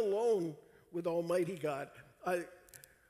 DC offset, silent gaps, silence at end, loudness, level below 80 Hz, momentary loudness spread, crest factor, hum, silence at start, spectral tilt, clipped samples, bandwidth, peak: under 0.1%; none; 0.3 s; -37 LUFS; -76 dBFS; 20 LU; 14 dB; none; 0 s; -6 dB/octave; under 0.1%; 15.5 kHz; -22 dBFS